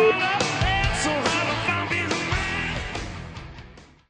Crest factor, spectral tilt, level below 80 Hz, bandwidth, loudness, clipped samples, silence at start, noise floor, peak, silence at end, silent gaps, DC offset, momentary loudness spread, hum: 16 dB; -4 dB/octave; -36 dBFS; 10 kHz; -23 LUFS; under 0.1%; 0 s; -46 dBFS; -8 dBFS; 0.25 s; none; under 0.1%; 16 LU; none